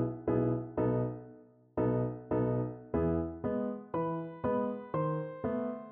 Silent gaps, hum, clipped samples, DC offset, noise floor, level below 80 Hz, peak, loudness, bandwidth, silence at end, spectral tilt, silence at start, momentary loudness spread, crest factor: none; none; under 0.1%; under 0.1%; -56 dBFS; -54 dBFS; -18 dBFS; -34 LUFS; 3.5 kHz; 0 s; -10 dB/octave; 0 s; 5 LU; 16 dB